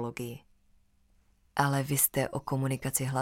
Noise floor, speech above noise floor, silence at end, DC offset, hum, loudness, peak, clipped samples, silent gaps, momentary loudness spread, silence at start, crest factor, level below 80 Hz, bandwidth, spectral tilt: -66 dBFS; 36 dB; 0 s; under 0.1%; none; -29 LUFS; -10 dBFS; under 0.1%; none; 14 LU; 0 s; 22 dB; -60 dBFS; 17 kHz; -4.5 dB/octave